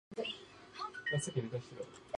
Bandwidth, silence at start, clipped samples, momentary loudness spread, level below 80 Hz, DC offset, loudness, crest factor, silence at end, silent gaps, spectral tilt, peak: 11 kHz; 0.1 s; under 0.1%; 12 LU; -72 dBFS; under 0.1%; -41 LUFS; 18 dB; 0 s; none; -4.5 dB/octave; -24 dBFS